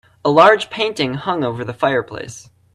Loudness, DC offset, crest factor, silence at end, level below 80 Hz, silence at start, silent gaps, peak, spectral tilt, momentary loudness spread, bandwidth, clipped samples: -16 LUFS; under 0.1%; 18 dB; 0.35 s; -56 dBFS; 0.25 s; none; 0 dBFS; -5 dB/octave; 18 LU; 12 kHz; under 0.1%